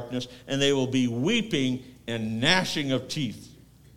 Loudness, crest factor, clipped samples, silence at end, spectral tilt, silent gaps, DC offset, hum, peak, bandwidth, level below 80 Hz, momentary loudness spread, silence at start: -26 LUFS; 22 dB; under 0.1%; 0 s; -4.5 dB/octave; none; under 0.1%; none; -4 dBFS; 16 kHz; -58 dBFS; 12 LU; 0 s